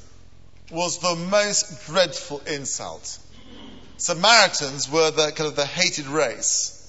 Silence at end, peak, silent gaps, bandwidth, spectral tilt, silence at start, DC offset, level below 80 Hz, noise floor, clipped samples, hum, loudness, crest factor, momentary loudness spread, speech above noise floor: 0.1 s; 0 dBFS; none; 8.2 kHz; -1.5 dB/octave; 0.7 s; 0.6%; -56 dBFS; -50 dBFS; under 0.1%; none; -21 LUFS; 24 dB; 15 LU; 28 dB